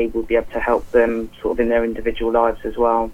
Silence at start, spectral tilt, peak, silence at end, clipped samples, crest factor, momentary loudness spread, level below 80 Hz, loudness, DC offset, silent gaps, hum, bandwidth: 0 s; -6.5 dB/octave; -2 dBFS; 0 s; under 0.1%; 18 dB; 5 LU; -36 dBFS; -19 LUFS; under 0.1%; none; none; 12.5 kHz